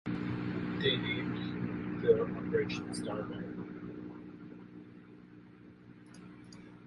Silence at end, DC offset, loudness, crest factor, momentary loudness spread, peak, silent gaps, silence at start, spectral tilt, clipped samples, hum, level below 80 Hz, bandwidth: 0 s; under 0.1%; -35 LUFS; 22 dB; 24 LU; -14 dBFS; none; 0.05 s; -6 dB/octave; under 0.1%; 60 Hz at -50 dBFS; -62 dBFS; 11 kHz